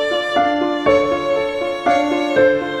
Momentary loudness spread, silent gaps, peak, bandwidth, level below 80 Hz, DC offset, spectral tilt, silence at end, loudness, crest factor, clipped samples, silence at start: 5 LU; none; -2 dBFS; 10.5 kHz; -48 dBFS; under 0.1%; -5 dB/octave; 0 s; -17 LUFS; 14 dB; under 0.1%; 0 s